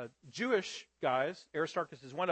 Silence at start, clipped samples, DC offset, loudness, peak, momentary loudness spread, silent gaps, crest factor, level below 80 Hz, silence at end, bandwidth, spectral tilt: 0 s; under 0.1%; under 0.1%; -36 LUFS; -18 dBFS; 9 LU; none; 18 dB; -82 dBFS; 0 s; 8.4 kHz; -4.5 dB/octave